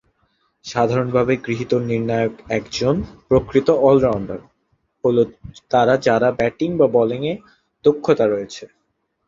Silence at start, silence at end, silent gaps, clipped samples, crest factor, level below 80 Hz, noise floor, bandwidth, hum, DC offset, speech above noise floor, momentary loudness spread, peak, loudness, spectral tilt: 0.65 s; 0.6 s; none; under 0.1%; 18 dB; -46 dBFS; -70 dBFS; 7.6 kHz; none; under 0.1%; 52 dB; 11 LU; -2 dBFS; -19 LUFS; -6.5 dB/octave